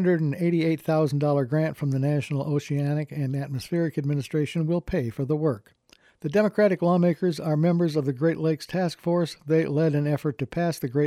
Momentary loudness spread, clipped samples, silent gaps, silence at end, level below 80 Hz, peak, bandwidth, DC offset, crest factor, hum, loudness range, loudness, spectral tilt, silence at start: 6 LU; under 0.1%; none; 0 s; -56 dBFS; -10 dBFS; 14.5 kHz; under 0.1%; 14 dB; none; 3 LU; -25 LUFS; -8 dB/octave; 0 s